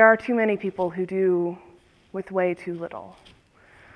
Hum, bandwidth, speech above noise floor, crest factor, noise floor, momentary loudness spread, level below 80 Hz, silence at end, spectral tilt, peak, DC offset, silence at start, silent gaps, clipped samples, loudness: none; 9.6 kHz; 32 dB; 22 dB; -55 dBFS; 16 LU; -64 dBFS; 0.85 s; -8 dB/octave; -2 dBFS; under 0.1%; 0 s; none; under 0.1%; -25 LUFS